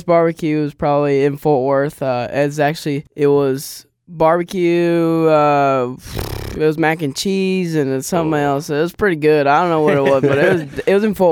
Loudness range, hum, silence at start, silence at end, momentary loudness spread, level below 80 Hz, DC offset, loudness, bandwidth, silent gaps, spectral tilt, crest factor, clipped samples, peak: 2 LU; none; 0.05 s; 0 s; 7 LU; -44 dBFS; under 0.1%; -16 LUFS; 19 kHz; none; -6 dB/octave; 12 dB; under 0.1%; -2 dBFS